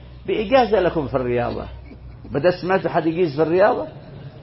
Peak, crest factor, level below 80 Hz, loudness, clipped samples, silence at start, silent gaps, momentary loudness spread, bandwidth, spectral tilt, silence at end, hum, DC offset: -4 dBFS; 16 dB; -42 dBFS; -20 LUFS; under 0.1%; 0 s; none; 22 LU; 5.8 kHz; -10.5 dB/octave; 0 s; none; under 0.1%